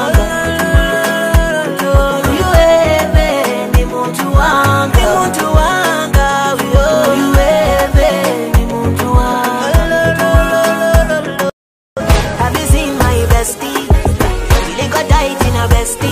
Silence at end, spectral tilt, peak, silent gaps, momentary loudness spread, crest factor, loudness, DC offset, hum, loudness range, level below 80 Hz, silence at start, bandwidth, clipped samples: 0 s; -5 dB/octave; 0 dBFS; 11.53-11.96 s; 5 LU; 12 dB; -12 LUFS; under 0.1%; none; 2 LU; -16 dBFS; 0 s; 16 kHz; under 0.1%